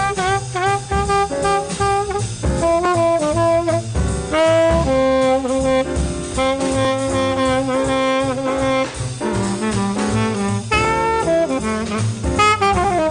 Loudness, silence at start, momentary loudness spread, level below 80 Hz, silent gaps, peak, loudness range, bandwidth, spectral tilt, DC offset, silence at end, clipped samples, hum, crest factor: -18 LUFS; 0 s; 6 LU; -32 dBFS; none; -4 dBFS; 2 LU; 10 kHz; -5 dB/octave; under 0.1%; 0 s; under 0.1%; none; 14 dB